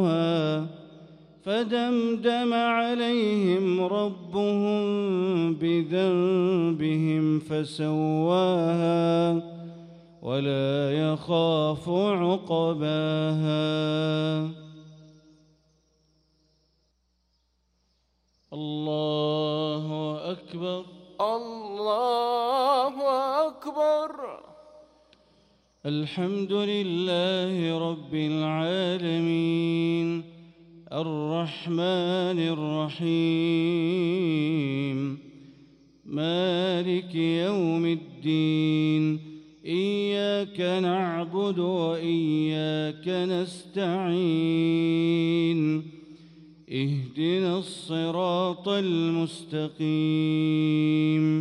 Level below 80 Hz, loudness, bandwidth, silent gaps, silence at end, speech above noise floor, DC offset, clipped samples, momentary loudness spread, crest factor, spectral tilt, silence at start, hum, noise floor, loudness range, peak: -70 dBFS; -26 LUFS; 10.5 kHz; none; 0 s; 46 dB; under 0.1%; under 0.1%; 8 LU; 14 dB; -7.5 dB/octave; 0 s; none; -71 dBFS; 5 LU; -12 dBFS